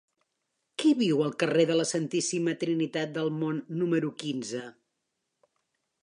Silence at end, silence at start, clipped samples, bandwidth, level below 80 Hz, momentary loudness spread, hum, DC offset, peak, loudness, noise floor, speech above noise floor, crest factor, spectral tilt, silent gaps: 1.3 s; 0.8 s; under 0.1%; 11 kHz; -82 dBFS; 10 LU; none; under 0.1%; -12 dBFS; -28 LUFS; -82 dBFS; 54 dB; 18 dB; -5 dB/octave; none